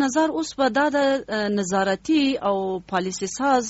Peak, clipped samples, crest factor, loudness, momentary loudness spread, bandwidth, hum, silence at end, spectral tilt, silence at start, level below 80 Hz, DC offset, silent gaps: -8 dBFS; under 0.1%; 14 dB; -22 LUFS; 6 LU; 8.2 kHz; none; 0 s; -4 dB/octave; 0 s; -56 dBFS; under 0.1%; none